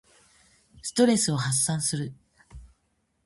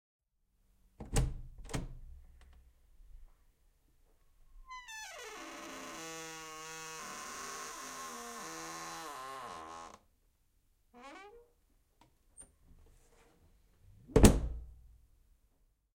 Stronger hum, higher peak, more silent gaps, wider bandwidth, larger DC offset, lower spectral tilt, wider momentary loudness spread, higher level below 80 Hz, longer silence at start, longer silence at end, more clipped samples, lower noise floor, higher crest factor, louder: neither; about the same, -8 dBFS vs -6 dBFS; neither; second, 12 kHz vs 16.5 kHz; neither; about the same, -4 dB/octave vs -5 dB/octave; second, 14 LU vs 21 LU; second, -56 dBFS vs -44 dBFS; second, 0.85 s vs 1 s; second, 0.6 s vs 1.05 s; neither; about the same, -73 dBFS vs -75 dBFS; second, 20 dB vs 34 dB; first, -24 LUFS vs -37 LUFS